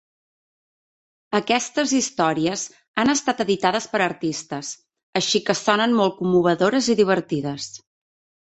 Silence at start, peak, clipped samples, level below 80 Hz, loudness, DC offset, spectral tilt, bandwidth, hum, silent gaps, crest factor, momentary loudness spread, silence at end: 1.3 s; -2 dBFS; under 0.1%; -62 dBFS; -21 LUFS; under 0.1%; -3.5 dB/octave; 8.4 kHz; none; 2.88-2.94 s, 5.03-5.13 s; 20 dB; 11 LU; 0.7 s